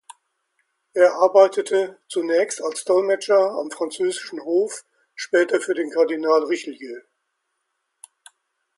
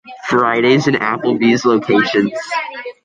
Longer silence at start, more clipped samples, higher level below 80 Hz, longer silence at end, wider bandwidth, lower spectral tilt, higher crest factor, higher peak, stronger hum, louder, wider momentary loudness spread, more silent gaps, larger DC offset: first, 0.95 s vs 0.05 s; neither; second, -78 dBFS vs -58 dBFS; first, 1.75 s vs 0.15 s; first, 11.5 kHz vs 9.2 kHz; second, -3 dB/octave vs -5.5 dB/octave; first, 20 dB vs 14 dB; about the same, -2 dBFS vs -2 dBFS; neither; second, -20 LUFS vs -15 LUFS; first, 14 LU vs 9 LU; neither; neither